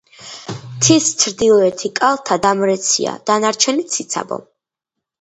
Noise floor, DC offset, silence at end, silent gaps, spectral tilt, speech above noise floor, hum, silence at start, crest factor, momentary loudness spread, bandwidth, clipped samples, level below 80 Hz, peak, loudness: -81 dBFS; under 0.1%; 0.8 s; none; -3 dB/octave; 66 dB; none; 0.2 s; 18 dB; 17 LU; 10 kHz; under 0.1%; -56 dBFS; 0 dBFS; -15 LUFS